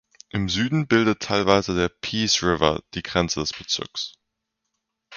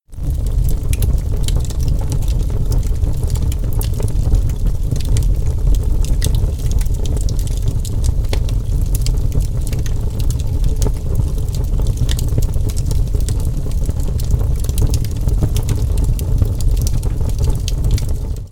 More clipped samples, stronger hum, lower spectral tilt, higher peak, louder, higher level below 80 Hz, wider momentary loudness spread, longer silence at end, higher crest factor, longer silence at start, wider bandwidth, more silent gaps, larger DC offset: neither; neither; second, -4 dB/octave vs -6 dB/octave; about the same, -2 dBFS vs 0 dBFS; second, -22 LUFS vs -19 LUFS; second, -46 dBFS vs -16 dBFS; first, 10 LU vs 3 LU; about the same, 0 s vs 0 s; first, 22 dB vs 14 dB; first, 0.35 s vs 0.1 s; second, 7.2 kHz vs 17.5 kHz; neither; neither